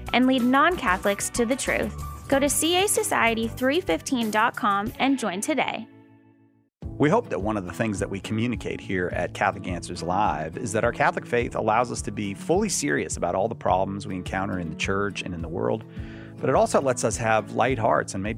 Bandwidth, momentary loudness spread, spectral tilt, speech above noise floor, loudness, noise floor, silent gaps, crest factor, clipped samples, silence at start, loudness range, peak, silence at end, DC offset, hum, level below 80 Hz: 16 kHz; 10 LU; -4 dB/octave; 36 dB; -24 LUFS; -61 dBFS; none; 18 dB; under 0.1%; 0 s; 5 LU; -6 dBFS; 0 s; under 0.1%; none; -44 dBFS